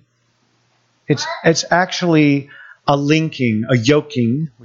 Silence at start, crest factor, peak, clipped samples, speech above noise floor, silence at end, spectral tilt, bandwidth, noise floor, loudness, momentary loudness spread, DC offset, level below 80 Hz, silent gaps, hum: 1.1 s; 16 dB; 0 dBFS; under 0.1%; 46 dB; 0.15 s; -5.5 dB/octave; 7.6 kHz; -62 dBFS; -16 LUFS; 6 LU; under 0.1%; -56 dBFS; none; none